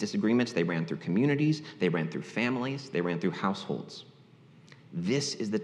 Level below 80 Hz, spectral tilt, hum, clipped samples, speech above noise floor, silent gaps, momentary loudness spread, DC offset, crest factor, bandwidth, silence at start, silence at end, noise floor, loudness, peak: -78 dBFS; -6 dB/octave; none; under 0.1%; 27 dB; none; 9 LU; under 0.1%; 18 dB; 10.5 kHz; 0 s; 0 s; -56 dBFS; -30 LUFS; -12 dBFS